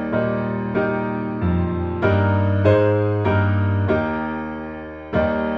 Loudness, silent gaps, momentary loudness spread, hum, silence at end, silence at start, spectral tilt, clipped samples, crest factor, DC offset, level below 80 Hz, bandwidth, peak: -20 LUFS; none; 10 LU; none; 0 s; 0 s; -10 dB/octave; under 0.1%; 16 dB; under 0.1%; -40 dBFS; 4.9 kHz; -2 dBFS